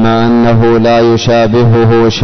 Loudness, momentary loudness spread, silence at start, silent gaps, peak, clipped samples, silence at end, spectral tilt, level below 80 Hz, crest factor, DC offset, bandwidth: -8 LUFS; 1 LU; 0 s; none; -2 dBFS; under 0.1%; 0 s; -7 dB/octave; -32 dBFS; 4 dB; under 0.1%; 6.4 kHz